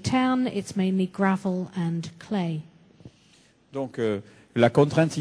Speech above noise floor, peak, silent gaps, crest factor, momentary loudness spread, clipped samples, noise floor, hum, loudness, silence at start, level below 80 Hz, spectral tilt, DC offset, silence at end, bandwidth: 34 dB; -4 dBFS; none; 22 dB; 13 LU; under 0.1%; -59 dBFS; none; -26 LUFS; 0 s; -60 dBFS; -6.5 dB/octave; under 0.1%; 0 s; 11 kHz